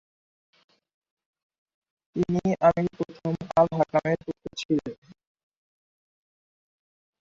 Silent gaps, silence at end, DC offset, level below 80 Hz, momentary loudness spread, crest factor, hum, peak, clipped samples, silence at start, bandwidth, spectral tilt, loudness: 4.65-4.69 s; 2.3 s; under 0.1%; -60 dBFS; 13 LU; 22 dB; none; -6 dBFS; under 0.1%; 2.15 s; 7.6 kHz; -7.5 dB/octave; -26 LUFS